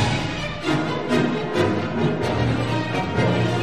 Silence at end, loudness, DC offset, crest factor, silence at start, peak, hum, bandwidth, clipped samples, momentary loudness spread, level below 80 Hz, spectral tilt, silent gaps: 0 s; -22 LUFS; 0.9%; 16 dB; 0 s; -6 dBFS; none; 12 kHz; under 0.1%; 3 LU; -42 dBFS; -6.5 dB/octave; none